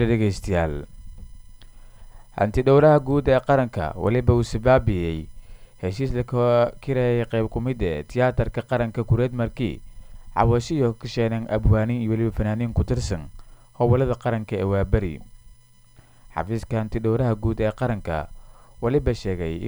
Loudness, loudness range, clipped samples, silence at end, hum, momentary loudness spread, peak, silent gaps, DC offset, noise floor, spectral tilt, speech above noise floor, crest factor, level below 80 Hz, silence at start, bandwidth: -23 LUFS; 6 LU; under 0.1%; 0 s; none; 11 LU; -4 dBFS; none; under 0.1%; -51 dBFS; -8 dB/octave; 30 dB; 18 dB; -34 dBFS; 0 s; over 20 kHz